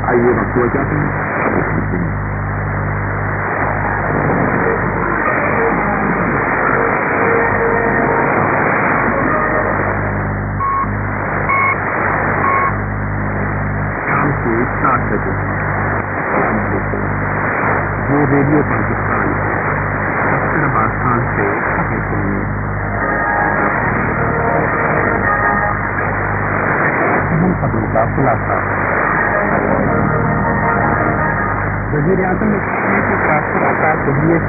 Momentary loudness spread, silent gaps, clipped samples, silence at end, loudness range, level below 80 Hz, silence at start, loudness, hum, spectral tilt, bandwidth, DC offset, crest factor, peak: 5 LU; none; under 0.1%; 0 s; 3 LU; -30 dBFS; 0 s; -15 LUFS; none; -16.5 dB/octave; 2.7 kHz; under 0.1%; 16 dB; 0 dBFS